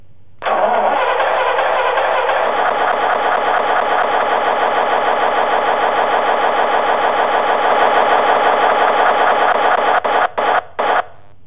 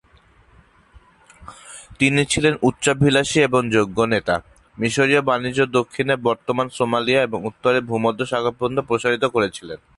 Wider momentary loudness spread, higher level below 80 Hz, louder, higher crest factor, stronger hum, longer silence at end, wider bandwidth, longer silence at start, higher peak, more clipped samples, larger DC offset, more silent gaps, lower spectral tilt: second, 3 LU vs 7 LU; second, -56 dBFS vs -50 dBFS; first, -14 LUFS vs -19 LUFS; about the same, 14 dB vs 18 dB; neither; first, 0.4 s vs 0.2 s; second, 4 kHz vs 11.5 kHz; second, 0.4 s vs 0.95 s; about the same, -2 dBFS vs -2 dBFS; neither; first, 2% vs under 0.1%; neither; first, -6.5 dB/octave vs -4.5 dB/octave